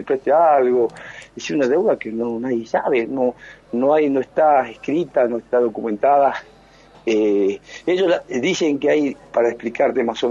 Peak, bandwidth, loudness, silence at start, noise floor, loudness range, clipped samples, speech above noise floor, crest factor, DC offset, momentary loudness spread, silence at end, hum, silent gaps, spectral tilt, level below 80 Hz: -4 dBFS; 7.6 kHz; -19 LUFS; 0 s; -48 dBFS; 2 LU; under 0.1%; 29 dB; 14 dB; under 0.1%; 8 LU; 0 s; none; none; -5.5 dB/octave; -58 dBFS